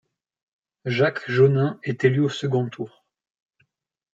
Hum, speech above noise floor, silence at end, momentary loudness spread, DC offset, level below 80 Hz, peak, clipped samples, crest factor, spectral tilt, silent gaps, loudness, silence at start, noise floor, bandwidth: none; 48 dB; 1.25 s; 15 LU; under 0.1%; -66 dBFS; -6 dBFS; under 0.1%; 18 dB; -7.5 dB/octave; none; -22 LUFS; 0.85 s; -69 dBFS; 7.8 kHz